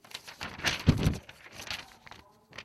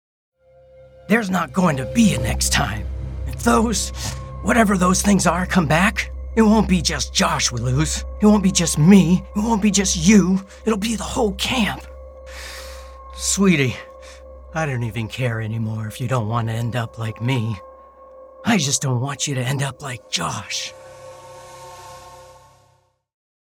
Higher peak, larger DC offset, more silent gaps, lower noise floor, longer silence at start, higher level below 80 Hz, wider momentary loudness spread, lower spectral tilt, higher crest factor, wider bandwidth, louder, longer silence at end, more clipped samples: second, -8 dBFS vs 0 dBFS; neither; neither; second, -54 dBFS vs -61 dBFS; second, 0.15 s vs 1.05 s; second, -44 dBFS vs -34 dBFS; first, 22 LU vs 19 LU; about the same, -5 dB/octave vs -4.5 dB/octave; about the same, 24 dB vs 20 dB; second, 14.5 kHz vs 17 kHz; second, -32 LUFS vs -19 LUFS; second, 0 s vs 1.25 s; neither